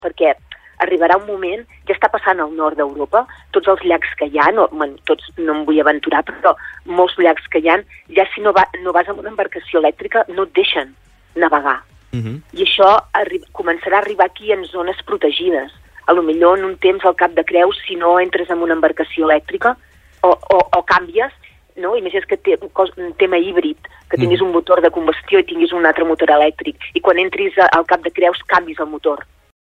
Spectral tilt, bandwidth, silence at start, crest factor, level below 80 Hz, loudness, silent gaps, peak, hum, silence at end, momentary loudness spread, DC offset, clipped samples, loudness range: -6.5 dB/octave; 6.6 kHz; 0 s; 16 dB; -48 dBFS; -15 LUFS; none; 0 dBFS; none; 0.55 s; 10 LU; under 0.1%; under 0.1%; 3 LU